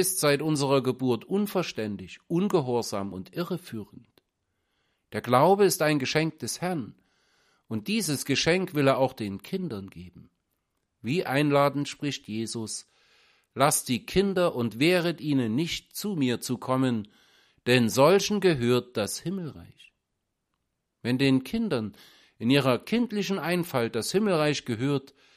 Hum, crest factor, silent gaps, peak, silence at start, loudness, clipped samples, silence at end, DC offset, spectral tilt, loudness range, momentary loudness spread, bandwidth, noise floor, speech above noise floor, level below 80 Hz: none; 20 dB; none; -6 dBFS; 0 s; -26 LUFS; under 0.1%; 0.35 s; under 0.1%; -5 dB/octave; 4 LU; 13 LU; 15.5 kHz; -81 dBFS; 55 dB; -60 dBFS